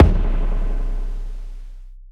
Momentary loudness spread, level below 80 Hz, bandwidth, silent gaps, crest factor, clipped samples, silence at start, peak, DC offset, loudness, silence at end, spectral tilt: 19 LU; -20 dBFS; 3.7 kHz; none; 18 dB; under 0.1%; 0 s; 0 dBFS; under 0.1%; -25 LUFS; 0 s; -9 dB/octave